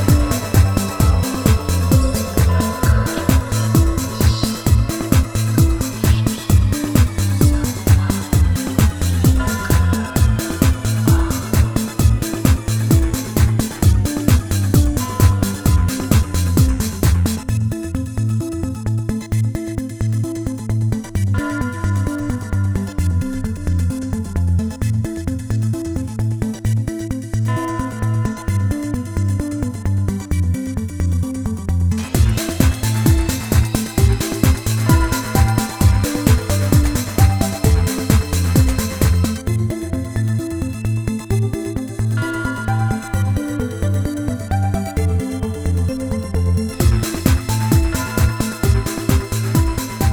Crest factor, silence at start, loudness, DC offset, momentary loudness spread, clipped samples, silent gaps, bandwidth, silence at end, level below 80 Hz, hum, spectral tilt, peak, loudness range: 16 dB; 0 s; -18 LUFS; 0.1%; 6 LU; under 0.1%; none; over 20 kHz; 0 s; -22 dBFS; none; -6 dB/octave; 0 dBFS; 5 LU